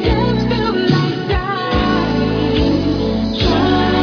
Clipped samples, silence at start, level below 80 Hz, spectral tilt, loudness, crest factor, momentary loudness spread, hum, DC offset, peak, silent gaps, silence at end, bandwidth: under 0.1%; 0 s; -26 dBFS; -7 dB/octave; -16 LUFS; 14 dB; 4 LU; none; under 0.1%; 0 dBFS; none; 0 s; 5.4 kHz